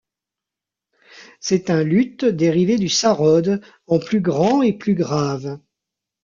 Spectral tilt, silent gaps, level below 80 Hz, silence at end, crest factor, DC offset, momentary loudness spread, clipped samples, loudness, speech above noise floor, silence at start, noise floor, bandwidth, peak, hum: -5.5 dB/octave; none; -58 dBFS; 0.65 s; 16 dB; under 0.1%; 9 LU; under 0.1%; -18 LUFS; 69 dB; 1.15 s; -86 dBFS; 7.6 kHz; -4 dBFS; none